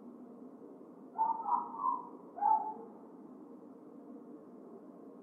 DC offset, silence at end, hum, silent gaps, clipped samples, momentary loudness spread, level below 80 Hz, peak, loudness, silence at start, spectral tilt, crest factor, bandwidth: under 0.1%; 0 s; none; none; under 0.1%; 21 LU; under -90 dBFS; -20 dBFS; -35 LUFS; 0 s; -9 dB/octave; 20 dB; 2.3 kHz